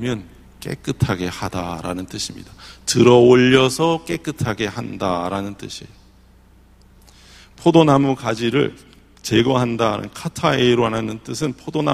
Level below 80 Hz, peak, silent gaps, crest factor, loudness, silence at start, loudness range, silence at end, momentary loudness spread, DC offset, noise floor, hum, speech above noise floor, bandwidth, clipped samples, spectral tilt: -46 dBFS; 0 dBFS; none; 20 dB; -18 LUFS; 0 s; 8 LU; 0 s; 17 LU; under 0.1%; -49 dBFS; none; 31 dB; 15 kHz; under 0.1%; -5.5 dB/octave